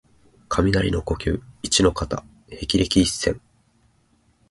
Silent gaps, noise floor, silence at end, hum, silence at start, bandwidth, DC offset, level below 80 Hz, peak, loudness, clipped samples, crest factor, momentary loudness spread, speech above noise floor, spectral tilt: none; -62 dBFS; 1.1 s; none; 0.5 s; 11.5 kHz; under 0.1%; -36 dBFS; -4 dBFS; -22 LUFS; under 0.1%; 20 dB; 13 LU; 40 dB; -4.5 dB/octave